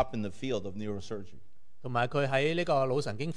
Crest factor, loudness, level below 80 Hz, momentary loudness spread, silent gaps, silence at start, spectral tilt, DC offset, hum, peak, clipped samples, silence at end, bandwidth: 18 dB; -31 LUFS; -60 dBFS; 12 LU; none; 0 s; -6 dB/octave; 1%; none; -14 dBFS; under 0.1%; 0.05 s; 10.5 kHz